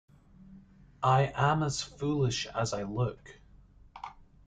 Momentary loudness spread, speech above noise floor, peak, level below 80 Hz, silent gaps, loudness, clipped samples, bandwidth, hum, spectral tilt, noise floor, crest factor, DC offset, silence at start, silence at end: 20 LU; 27 dB; -14 dBFS; -56 dBFS; none; -30 LUFS; under 0.1%; 9.4 kHz; none; -5.5 dB/octave; -57 dBFS; 18 dB; under 0.1%; 0.4 s; 0.35 s